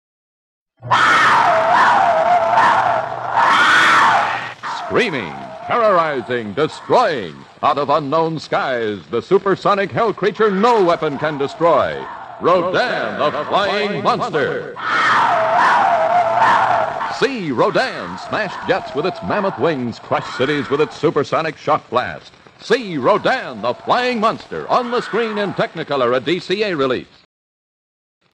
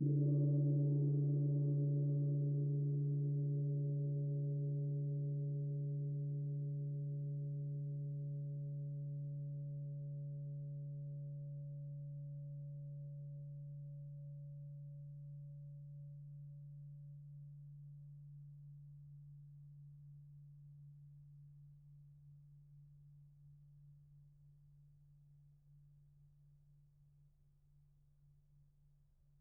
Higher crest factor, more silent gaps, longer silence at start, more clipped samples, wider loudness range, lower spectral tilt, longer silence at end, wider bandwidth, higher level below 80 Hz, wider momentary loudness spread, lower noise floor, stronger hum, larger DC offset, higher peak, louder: about the same, 16 dB vs 16 dB; neither; first, 0.8 s vs 0 s; neither; second, 6 LU vs 24 LU; second, -5 dB/octave vs -18 dB/octave; second, 1.3 s vs 3.15 s; first, 12 kHz vs 0.8 kHz; first, -58 dBFS vs -74 dBFS; second, 10 LU vs 23 LU; first, under -90 dBFS vs -71 dBFS; neither; neither; first, -2 dBFS vs -26 dBFS; first, -16 LUFS vs -41 LUFS